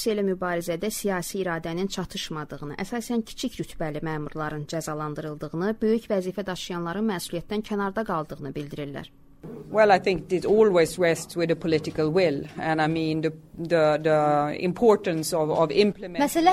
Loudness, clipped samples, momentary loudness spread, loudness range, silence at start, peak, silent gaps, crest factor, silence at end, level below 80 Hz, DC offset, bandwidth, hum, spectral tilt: -25 LUFS; under 0.1%; 12 LU; 8 LU; 0 s; -6 dBFS; none; 20 dB; 0 s; -52 dBFS; under 0.1%; 16 kHz; none; -5.5 dB/octave